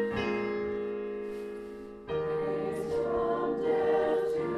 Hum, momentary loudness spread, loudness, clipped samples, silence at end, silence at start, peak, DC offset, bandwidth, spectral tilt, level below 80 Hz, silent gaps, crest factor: none; 12 LU; -31 LUFS; under 0.1%; 0 s; 0 s; -18 dBFS; under 0.1%; 12 kHz; -7 dB/octave; -58 dBFS; none; 14 dB